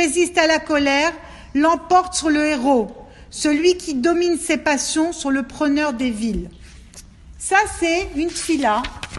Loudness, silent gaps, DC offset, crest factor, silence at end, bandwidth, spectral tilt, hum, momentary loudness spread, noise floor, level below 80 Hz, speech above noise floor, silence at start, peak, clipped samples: -19 LUFS; none; under 0.1%; 20 dB; 0 s; 12 kHz; -3 dB/octave; none; 8 LU; -42 dBFS; -42 dBFS; 24 dB; 0 s; 0 dBFS; under 0.1%